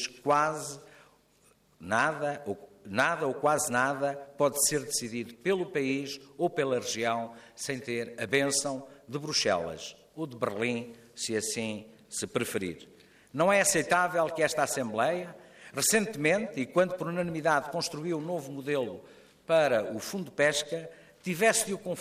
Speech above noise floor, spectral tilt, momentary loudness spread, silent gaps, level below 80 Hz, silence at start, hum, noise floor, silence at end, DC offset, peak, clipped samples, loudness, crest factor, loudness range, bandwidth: 35 dB; -3 dB/octave; 15 LU; none; -70 dBFS; 0 s; none; -65 dBFS; 0 s; under 0.1%; -10 dBFS; under 0.1%; -29 LUFS; 20 dB; 4 LU; 15.5 kHz